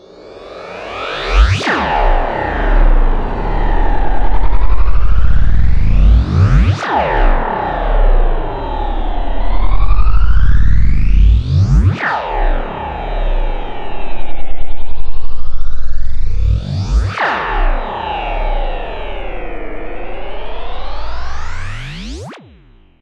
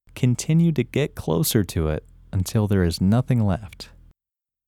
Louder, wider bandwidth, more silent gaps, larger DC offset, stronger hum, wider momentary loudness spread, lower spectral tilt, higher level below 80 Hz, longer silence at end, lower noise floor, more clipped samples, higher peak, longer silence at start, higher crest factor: first, -17 LUFS vs -22 LUFS; second, 6.6 kHz vs 17.5 kHz; neither; neither; neither; first, 15 LU vs 11 LU; about the same, -7 dB/octave vs -6 dB/octave; first, -14 dBFS vs -40 dBFS; second, 0.65 s vs 0.85 s; second, -44 dBFS vs -89 dBFS; neither; first, 0 dBFS vs -6 dBFS; first, 0.3 s vs 0.15 s; second, 8 dB vs 16 dB